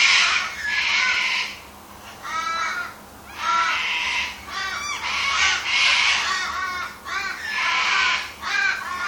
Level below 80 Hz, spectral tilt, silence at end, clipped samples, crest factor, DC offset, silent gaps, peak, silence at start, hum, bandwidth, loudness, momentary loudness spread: -54 dBFS; 1 dB/octave; 0 s; under 0.1%; 18 dB; under 0.1%; none; -4 dBFS; 0 s; none; 19.5 kHz; -21 LUFS; 13 LU